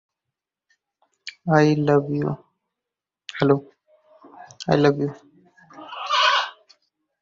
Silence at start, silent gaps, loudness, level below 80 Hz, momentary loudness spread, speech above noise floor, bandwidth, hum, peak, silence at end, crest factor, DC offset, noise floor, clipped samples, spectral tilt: 1.25 s; none; -21 LUFS; -60 dBFS; 20 LU; 68 dB; 7.6 kHz; none; -4 dBFS; 0.7 s; 20 dB; under 0.1%; -87 dBFS; under 0.1%; -6 dB/octave